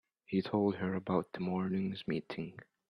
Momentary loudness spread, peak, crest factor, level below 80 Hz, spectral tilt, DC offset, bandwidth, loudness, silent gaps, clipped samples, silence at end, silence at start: 9 LU; -18 dBFS; 18 dB; -72 dBFS; -9 dB/octave; under 0.1%; 5.4 kHz; -36 LUFS; none; under 0.1%; 0.25 s; 0.3 s